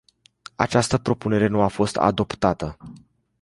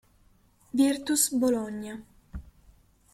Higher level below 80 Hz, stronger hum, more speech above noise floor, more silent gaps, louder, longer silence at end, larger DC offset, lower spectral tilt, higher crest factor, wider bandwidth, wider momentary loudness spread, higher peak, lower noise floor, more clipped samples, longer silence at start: first, -46 dBFS vs -54 dBFS; neither; second, 26 dB vs 36 dB; neither; first, -22 LUFS vs -26 LUFS; second, 0.45 s vs 0.7 s; neither; first, -5.5 dB/octave vs -3 dB/octave; about the same, 20 dB vs 20 dB; second, 11.5 kHz vs 16 kHz; second, 11 LU vs 22 LU; first, -2 dBFS vs -10 dBFS; second, -47 dBFS vs -62 dBFS; neither; second, 0.6 s vs 0.75 s